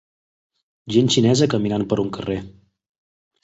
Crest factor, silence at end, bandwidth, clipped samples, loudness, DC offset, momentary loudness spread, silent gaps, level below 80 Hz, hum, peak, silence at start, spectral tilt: 18 dB; 0.95 s; 8.2 kHz; under 0.1%; -20 LUFS; under 0.1%; 11 LU; none; -50 dBFS; none; -4 dBFS; 0.85 s; -5.5 dB/octave